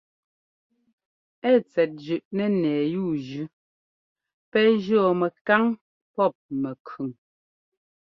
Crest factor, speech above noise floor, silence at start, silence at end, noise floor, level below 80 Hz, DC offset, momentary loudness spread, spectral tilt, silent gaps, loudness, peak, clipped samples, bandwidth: 22 dB; over 67 dB; 1.45 s; 1.05 s; under -90 dBFS; -70 dBFS; under 0.1%; 14 LU; -8 dB/octave; 2.25-2.31 s, 3.53-4.16 s, 4.34-4.52 s, 5.41-5.45 s, 5.81-6.14 s, 6.35-6.49 s, 6.80-6.85 s; -24 LUFS; -4 dBFS; under 0.1%; 6.2 kHz